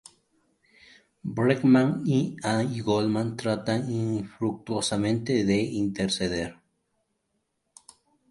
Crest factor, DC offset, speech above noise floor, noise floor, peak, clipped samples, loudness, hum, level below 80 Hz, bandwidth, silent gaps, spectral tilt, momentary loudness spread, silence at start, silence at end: 20 dB; under 0.1%; 52 dB; -77 dBFS; -8 dBFS; under 0.1%; -26 LUFS; none; -58 dBFS; 11.5 kHz; none; -6 dB/octave; 9 LU; 1.25 s; 1.8 s